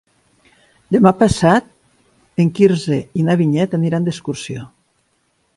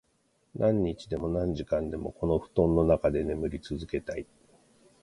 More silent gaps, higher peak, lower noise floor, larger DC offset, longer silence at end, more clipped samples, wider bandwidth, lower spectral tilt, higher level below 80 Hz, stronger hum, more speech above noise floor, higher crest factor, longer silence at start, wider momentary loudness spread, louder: neither; first, 0 dBFS vs -10 dBFS; second, -63 dBFS vs -71 dBFS; neither; about the same, 0.9 s vs 0.8 s; neither; about the same, 11.5 kHz vs 11.5 kHz; second, -7 dB/octave vs -8.5 dB/octave; about the same, -44 dBFS vs -44 dBFS; neither; first, 49 dB vs 42 dB; about the same, 18 dB vs 20 dB; first, 0.9 s vs 0.55 s; about the same, 13 LU vs 13 LU; first, -16 LUFS vs -29 LUFS